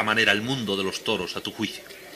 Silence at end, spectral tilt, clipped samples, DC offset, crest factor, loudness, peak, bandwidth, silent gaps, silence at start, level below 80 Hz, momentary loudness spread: 0 s; -3.5 dB/octave; under 0.1%; under 0.1%; 22 dB; -25 LUFS; -4 dBFS; 15.5 kHz; none; 0 s; -60 dBFS; 11 LU